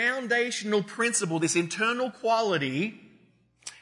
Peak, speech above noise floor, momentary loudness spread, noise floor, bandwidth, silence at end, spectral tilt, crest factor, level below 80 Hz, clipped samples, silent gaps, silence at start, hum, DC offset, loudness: -12 dBFS; 35 dB; 6 LU; -62 dBFS; 11 kHz; 0.05 s; -3.5 dB/octave; 16 dB; -78 dBFS; under 0.1%; none; 0 s; none; under 0.1%; -27 LUFS